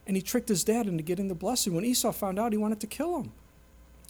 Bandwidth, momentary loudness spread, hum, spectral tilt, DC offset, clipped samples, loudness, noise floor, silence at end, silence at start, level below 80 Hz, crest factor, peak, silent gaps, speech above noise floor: over 20 kHz; 6 LU; none; -4.5 dB/octave; under 0.1%; under 0.1%; -29 LUFS; -55 dBFS; 0.25 s; 0.05 s; -56 dBFS; 16 dB; -14 dBFS; none; 26 dB